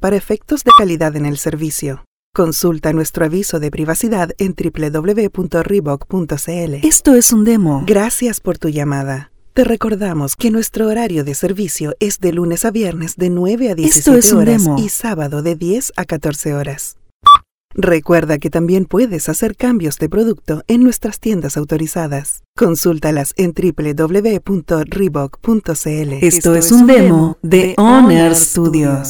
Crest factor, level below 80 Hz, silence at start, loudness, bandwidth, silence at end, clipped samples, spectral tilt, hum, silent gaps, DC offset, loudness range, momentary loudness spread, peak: 12 dB; -36 dBFS; 0 s; -13 LUFS; over 20 kHz; 0 s; 0.2%; -5 dB/octave; none; 2.07-2.33 s, 17.14-17.20 s, 17.51-17.69 s, 22.48-22.54 s; under 0.1%; 5 LU; 12 LU; 0 dBFS